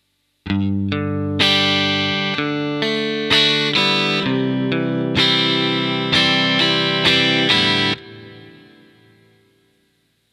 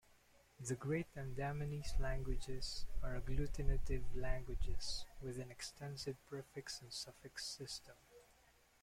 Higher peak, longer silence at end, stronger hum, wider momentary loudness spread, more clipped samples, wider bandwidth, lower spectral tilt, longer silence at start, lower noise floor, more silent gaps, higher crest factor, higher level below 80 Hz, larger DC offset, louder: first, -2 dBFS vs -22 dBFS; first, 1.8 s vs 0.6 s; neither; about the same, 8 LU vs 8 LU; neither; about the same, 13.5 kHz vs 14.5 kHz; about the same, -4.5 dB/octave vs -4.5 dB/octave; second, 0.45 s vs 0.6 s; second, -64 dBFS vs -71 dBFS; neither; about the same, 18 dB vs 20 dB; second, -52 dBFS vs -46 dBFS; neither; first, -16 LUFS vs -46 LUFS